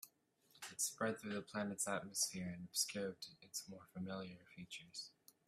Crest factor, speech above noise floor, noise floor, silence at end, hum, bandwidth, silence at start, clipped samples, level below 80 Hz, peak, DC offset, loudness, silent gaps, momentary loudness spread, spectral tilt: 22 dB; 29 dB; -75 dBFS; 0.35 s; none; 15.5 kHz; 0 s; under 0.1%; -82 dBFS; -24 dBFS; under 0.1%; -44 LUFS; none; 14 LU; -2.5 dB/octave